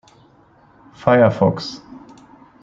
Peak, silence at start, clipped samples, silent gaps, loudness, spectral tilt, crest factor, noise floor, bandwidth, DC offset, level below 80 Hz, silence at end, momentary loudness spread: -2 dBFS; 1 s; under 0.1%; none; -16 LUFS; -7.5 dB/octave; 18 dB; -52 dBFS; 7.6 kHz; under 0.1%; -56 dBFS; 0.65 s; 17 LU